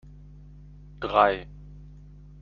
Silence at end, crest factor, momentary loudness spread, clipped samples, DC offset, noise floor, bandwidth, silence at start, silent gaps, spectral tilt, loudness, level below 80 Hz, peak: 0.5 s; 24 dB; 26 LU; under 0.1%; under 0.1%; -47 dBFS; 6.8 kHz; 1 s; none; -3 dB/octave; -24 LUFS; -48 dBFS; -4 dBFS